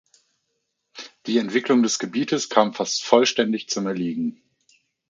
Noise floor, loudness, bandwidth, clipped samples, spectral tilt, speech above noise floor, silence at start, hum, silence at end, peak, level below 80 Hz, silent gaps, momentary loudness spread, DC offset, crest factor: -76 dBFS; -22 LUFS; 9.2 kHz; under 0.1%; -3.5 dB/octave; 54 dB; 0.95 s; none; 0.75 s; 0 dBFS; -70 dBFS; none; 12 LU; under 0.1%; 22 dB